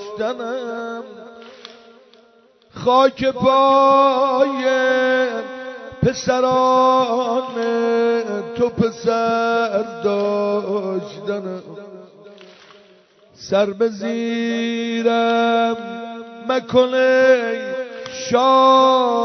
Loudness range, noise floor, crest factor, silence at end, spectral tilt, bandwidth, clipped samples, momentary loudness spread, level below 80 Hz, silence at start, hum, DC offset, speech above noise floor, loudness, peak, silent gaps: 8 LU; -53 dBFS; 16 dB; 0 s; -5 dB/octave; 6.4 kHz; under 0.1%; 17 LU; -56 dBFS; 0 s; none; under 0.1%; 36 dB; -18 LUFS; -2 dBFS; none